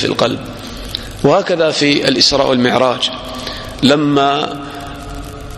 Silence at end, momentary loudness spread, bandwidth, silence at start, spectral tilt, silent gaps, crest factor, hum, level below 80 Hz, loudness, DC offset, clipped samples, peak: 0 s; 17 LU; 14.5 kHz; 0 s; -4.5 dB/octave; none; 14 dB; none; -36 dBFS; -14 LUFS; under 0.1%; under 0.1%; 0 dBFS